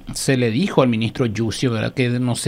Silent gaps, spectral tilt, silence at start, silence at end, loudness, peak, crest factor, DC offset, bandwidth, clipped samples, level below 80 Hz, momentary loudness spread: none; -5.5 dB/octave; 0 s; 0 s; -19 LUFS; 0 dBFS; 18 dB; under 0.1%; 16 kHz; under 0.1%; -46 dBFS; 4 LU